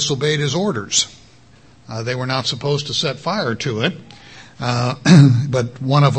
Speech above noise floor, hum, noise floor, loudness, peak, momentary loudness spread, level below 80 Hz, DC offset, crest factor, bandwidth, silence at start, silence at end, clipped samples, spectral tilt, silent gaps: 32 dB; none; -48 dBFS; -17 LUFS; 0 dBFS; 14 LU; -52 dBFS; 0.2%; 18 dB; 8.8 kHz; 0 s; 0 s; under 0.1%; -5 dB/octave; none